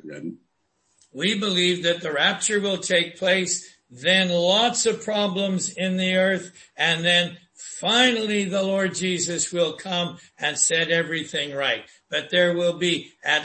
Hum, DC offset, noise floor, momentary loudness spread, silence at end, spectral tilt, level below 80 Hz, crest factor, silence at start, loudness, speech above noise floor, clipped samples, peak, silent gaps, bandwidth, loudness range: none; under 0.1%; -70 dBFS; 9 LU; 0 s; -2.5 dB/octave; -68 dBFS; 18 dB; 0.05 s; -22 LUFS; 47 dB; under 0.1%; -6 dBFS; none; 8.8 kHz; 2 LU